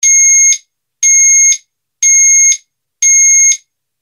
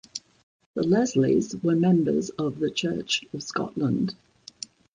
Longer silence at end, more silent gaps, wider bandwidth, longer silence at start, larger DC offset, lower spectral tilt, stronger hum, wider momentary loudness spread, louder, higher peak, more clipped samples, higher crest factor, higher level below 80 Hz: second, 0.45 s vs 0.8 s; second, none vs 0.43-0.60 s, 0.66-0.74 s; first, 16 kHz vs 9.8 kHz; second, 0 s vs 0.15 s; neither; second, 11.5 dB/octave vs -5.5 dB/octave; neither; second, 10 LU vs 18 LU; first, -6 LUFS vs -25 LUFS; first, 0 dBFS vs -10 dBFS; neither; second, 10 dB vs 16 dB; second, under -90 dBFS vs -60 dBFS